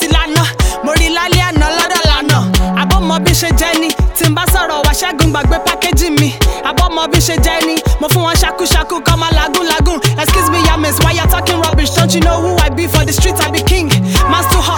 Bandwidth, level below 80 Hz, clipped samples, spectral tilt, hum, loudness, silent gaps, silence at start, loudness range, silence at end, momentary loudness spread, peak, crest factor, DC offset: 20 kHz; -16 dBFS; under 0.1%; -4 dB/octave; none; -11 LUFS; none; 0 s; 1 LU; 0 s; 2 LU; 0 dBFS; 10 dB; under 0.1%